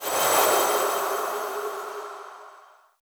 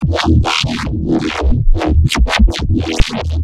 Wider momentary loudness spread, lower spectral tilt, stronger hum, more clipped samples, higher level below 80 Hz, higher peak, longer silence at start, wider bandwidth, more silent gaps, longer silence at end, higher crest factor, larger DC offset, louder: first, 19 LU vs 5 LU; second, -0.5 dB/octave vs -5.5 dB/octave; neither; second, under 0.1% vs 0.3%; second, -76 dBFS vs -16 dBFS; second, -8 dBFS vs 0 dBFS; about the same, 0 s vs 0 s; first, over 20 kHz vs 12.5 kHz; neither; first, 0.5 s vs 0 s; first, 18 dB vs 12 dB; neither; second, -23 LUFS vs -15 LUFS